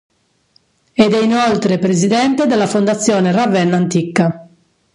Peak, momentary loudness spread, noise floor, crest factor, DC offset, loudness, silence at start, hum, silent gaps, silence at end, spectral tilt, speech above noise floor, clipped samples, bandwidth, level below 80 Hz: 0 dBFS; 3 LU; -57 dBFS; 14 dB; under 0.1%; -14 LUFS; 1 s; none; none; 0.5 s; -5.5 dB/octave; 44 dB; under 0.1%; 11.5 kHz; -56 dBFS